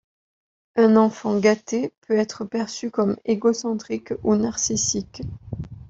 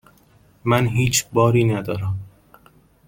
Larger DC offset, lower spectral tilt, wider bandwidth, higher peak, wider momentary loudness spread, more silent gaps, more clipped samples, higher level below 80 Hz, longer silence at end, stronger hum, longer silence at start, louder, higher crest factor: neither; about the same, -4.5 dB/octave vs -5 dB/octave; second, 8 kHz vs 17 kHz; about the same, -4 dBFS vs -2 dBFS; about the same, 12 LU vs 11 LU; first, 1.98-2.02 s vs none; neither; about the same, -52 dBFS vs -48 dBFS; second, 0.05 s vs 0.8 s; neither; about the same, 0.75 s vs 0.65 s; about the same, -22 LUFS vs -20 LUFS; about the same, 18 dB vs 18 dB